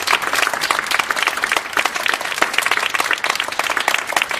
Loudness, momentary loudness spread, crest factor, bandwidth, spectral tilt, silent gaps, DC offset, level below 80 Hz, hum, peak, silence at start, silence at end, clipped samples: -17 LUFS; 3 LU; 20 dB; 15.5 kHz; 0.5 dB/octave; none; under 0.1%; -56 dBFS; none; 0 dBFS; 0 s; 0 s; under 0.1%